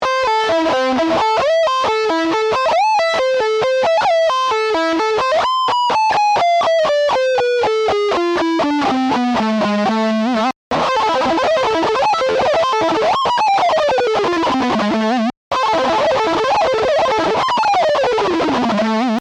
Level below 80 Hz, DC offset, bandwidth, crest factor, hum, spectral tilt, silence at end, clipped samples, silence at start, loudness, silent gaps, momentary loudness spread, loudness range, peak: -50 dBFS; under 0.1%; 11.5 kHz; 6 dB; none; -4 dB/octave; 0 s; under 0.1%; 0 s; -15 LUFS; 10.56-10.71 s, 15.37-15.51 s; 2 LU; 1 LU; -10 dBFS